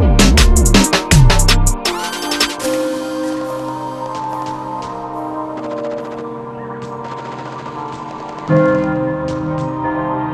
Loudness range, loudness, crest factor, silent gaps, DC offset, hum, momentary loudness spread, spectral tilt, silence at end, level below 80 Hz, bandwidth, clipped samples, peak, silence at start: 12 LU; -16 LUFS; 16 dB; none; under 0.1%; none; 16 LU; -4.5 dB/octave; 0 s; -20 dBFS; 13.5 kHz; under 0.1%; 0 dBFS; 0 s